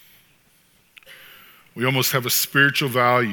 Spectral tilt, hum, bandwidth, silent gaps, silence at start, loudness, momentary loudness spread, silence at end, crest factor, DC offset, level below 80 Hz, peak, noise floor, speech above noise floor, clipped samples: -3.5 dB/octave; none; 19.5 kHz; none; 1.1 s; -19 LUFS; 7 LU; 0 s; 20 dB; under 0.1%; -70 dBFS; -2 dBFS; -59 dBFS; 39 dB; under 0.1%